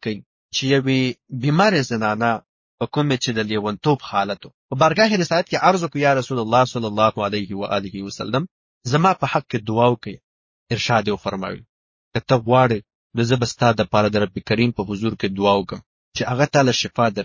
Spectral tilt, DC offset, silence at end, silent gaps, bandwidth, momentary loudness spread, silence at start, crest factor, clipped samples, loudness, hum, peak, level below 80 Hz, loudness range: -5.5 dB/octave; under 0.1%; 0 s; 0.26-0.49 s, 2.49-2.78 s, 4.54-4.69 s, 8.51-8.81 s, 10.24-10.66 s, 11.69-12.11 s, 12.95-13.10 s, 15.86-16.11 s; 7.6 kHz; 12 LU; 0.05 s; 18 dB; under 0.1%; -20 LUFS; none; -2 dBFS; -50 dBFS; 3 LU